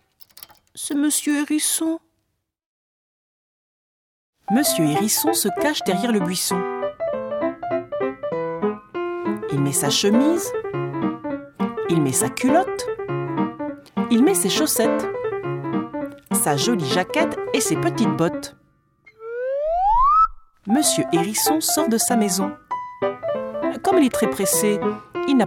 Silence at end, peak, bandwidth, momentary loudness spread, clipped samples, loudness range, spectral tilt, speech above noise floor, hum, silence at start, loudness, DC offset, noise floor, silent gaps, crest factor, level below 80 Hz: 0 s; -4 dBFS; 17.5 kHz; 9 LU; under 0.1%; 5 LU; -4 dB/octave; 54 dB; none; 0.75 s; -21 LUFS; under 0.1%; -74 dBFS; 2.66-4.33 s; 16 dB; -46 dBFS